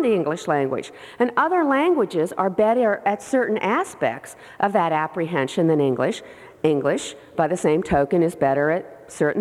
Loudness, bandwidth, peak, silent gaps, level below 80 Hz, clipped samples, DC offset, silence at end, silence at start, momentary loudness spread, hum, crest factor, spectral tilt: -21 LUFS; 14 kHz; -6 dBFS; none; -54 dBFS; under 0.1%; under 0.1%; 0 s; 0 s; 7 LU; none; 16 dB; -6 dB/octave